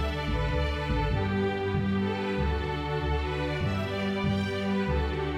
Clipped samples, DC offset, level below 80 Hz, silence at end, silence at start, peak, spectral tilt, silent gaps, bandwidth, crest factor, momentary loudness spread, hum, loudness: under 0.1%; under 0.1%; -34 dBFS; 0 s; 0 s; -16 dBFS; -7 dB/octave; none; 11 kHz; 12 dB; 2 LU; none; -29 LUFS